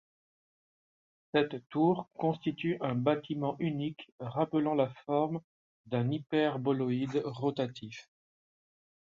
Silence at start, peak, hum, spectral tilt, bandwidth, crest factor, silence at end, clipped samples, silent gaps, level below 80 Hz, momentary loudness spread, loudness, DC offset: 1.35 s; -14 dBFS; none; -8 dB/octave; 7.4 kHz; 20 dB; 1 s; under 0.1%; 1.66-1.70 s, 4.12-4.18 s, 5.44-5.84 s; -74 dBFS; 8 LU; -33 LUFS; under 0.1%